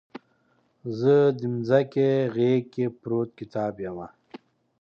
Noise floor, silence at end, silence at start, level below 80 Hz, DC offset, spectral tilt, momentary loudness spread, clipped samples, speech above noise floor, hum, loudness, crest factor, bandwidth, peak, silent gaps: -67 dBFS; 0.75 s; 0.15 s; -66 dBFS; under 0.1%; -9 dB/octave; 15 LU; under 0.1%; 43 dB; none; -25 LUFS; 18 dB; 6.8 kHz; -6 dBFS; none